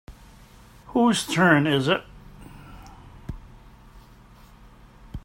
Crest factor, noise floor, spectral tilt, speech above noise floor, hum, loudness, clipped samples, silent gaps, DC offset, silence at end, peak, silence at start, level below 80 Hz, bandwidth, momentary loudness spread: 24 dB; -50 dBFS; -5 dB/octave; 30 dB; none; -21 LUFS; under 0.1%; none; under 0.1%; 0.05 s; -4 dBFS; 0.1 s; -48 dBFS; 16 kHz; 27 LU